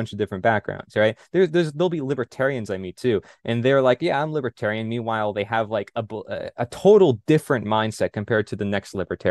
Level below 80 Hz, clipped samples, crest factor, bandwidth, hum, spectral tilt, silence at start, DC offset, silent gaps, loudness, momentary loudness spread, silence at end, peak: -60 dBFS; under 0.1%; 18 dB; 12.5 kHz; none; -6.5 dB/octave; 0 s; under 0.1%; none; -22 LUFS; 10 LU; 0 s; -4 dBFS